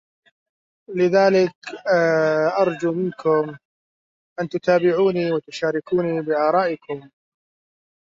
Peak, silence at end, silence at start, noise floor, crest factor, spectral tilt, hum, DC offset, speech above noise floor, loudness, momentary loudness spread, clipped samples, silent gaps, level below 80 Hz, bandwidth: -4 dBFS; 0.95 s; 0.9 s; under -90 dBFS; 18 dB; -6.5 dB/octave; none; under 0.1%; over 70 dB; -20 LUFS; 13 LU; under 0.1%; 1.55-1.62 s, 3.65-4.36 s; -68 dBFS; 7.6 kHz